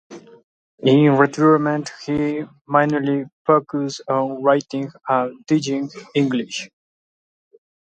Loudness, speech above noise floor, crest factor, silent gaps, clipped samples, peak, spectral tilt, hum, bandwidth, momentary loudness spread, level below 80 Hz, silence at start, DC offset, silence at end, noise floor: -19 LUFS; over 71 dB; 20 dB; 0.44-0.78 s, 2.61-2.65 s, 3.33-3.45 s; under 0.1%; 0 dBFS; -6.5 dB/octave; none; 8.8 kHz; 11 LU; -60 dBFS; 0.1 s; under 0.1%; 1.15 s; under -90 dBFS